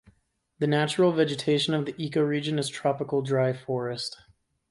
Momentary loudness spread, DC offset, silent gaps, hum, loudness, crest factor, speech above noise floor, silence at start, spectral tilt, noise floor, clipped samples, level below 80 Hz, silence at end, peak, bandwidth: 8 LU; under 0.1%; none; none; -26 LUFS; 18 dB; 43 dB; 0.6 s; -5.5 dB/octave; -69 dBFS; under 0.1%; -66 dBFS; 0.55 s; -10 dBFS; 11.5 kHz